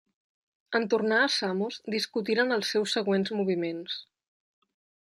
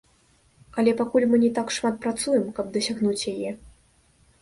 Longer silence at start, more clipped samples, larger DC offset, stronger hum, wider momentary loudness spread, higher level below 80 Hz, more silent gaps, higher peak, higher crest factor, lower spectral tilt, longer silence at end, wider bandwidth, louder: about the same, 0.7 s vs 0.75 s; neither; neither; neither; second, 8 LU vs 11 LU; second, -78 dBFS vs -58 dBFS; neither; second, -12 dBFS vs -8 dBFS; about the same, 18 dB vs 16 dB; about the same, -4 dB/octave vs -4.5 dB/octave; first, 1.15 s vs 0.75 s; first, 14 kHz vs 11.5 kHz; second, -28 LUFS vs -24 LUFS